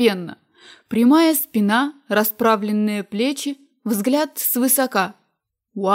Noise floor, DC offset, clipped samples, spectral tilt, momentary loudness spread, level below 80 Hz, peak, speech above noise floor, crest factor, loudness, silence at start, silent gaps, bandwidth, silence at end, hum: -74 dBFS; under 0.1%; under 0.1%; -4 dB/octave; 12 LU; -70 dBFS; -4 dBFS; 55 dB; 16 dB; -19 LUFS; 0 s; none; 16.5 kHz; 0 s; none